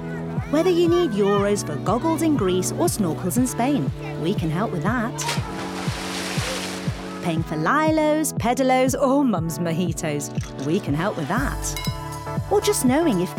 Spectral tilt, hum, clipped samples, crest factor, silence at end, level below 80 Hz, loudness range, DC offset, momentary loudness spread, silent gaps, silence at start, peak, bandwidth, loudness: -5 dB/octave; none; under 0.1%; 12 dB; 0 s; -40 dBFS; 4 LU; under 0.1%; 9 LU; none; 0 s; -8 dBFS; 17 kHz; -22 LUFS